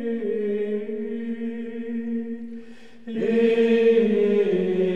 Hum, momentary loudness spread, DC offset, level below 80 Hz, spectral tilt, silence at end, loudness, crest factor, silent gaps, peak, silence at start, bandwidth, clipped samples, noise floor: none; 15 LU; 0.9%; -66 dBFS; -8 dB/octave; 0 s; -23 LUFS; 14 dB; none; -8 dBFS; 0 s; 7 kHz; under 0.1%; -44 dBFS